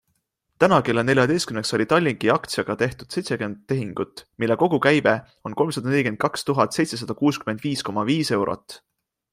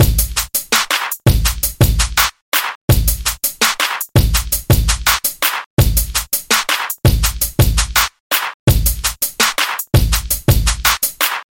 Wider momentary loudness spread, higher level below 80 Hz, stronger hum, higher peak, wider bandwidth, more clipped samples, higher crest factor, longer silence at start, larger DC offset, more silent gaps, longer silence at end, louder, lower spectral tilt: first, 9 LU vs 4 LU; second, -58 dBFS vs -20 dBFS; neither; about the same, -2 dBFS vs 0 dBFS; about the same, 16 kHz vs 17 kHz; neither; about the same, 20 dB vs 16 dB; first, 0.6 s vs 0 s; neither; second, none vs 2.42-2.52 s, 2.75-2.88 s, 5.66-5.77 s, 8.20-8.30 s, 8.54-8.67 s; first, 0.55 s vs 0.1 s; second, -22 LUFS vs -15 LUFS; first, -5.5 dB/octave vs -3 dB/octave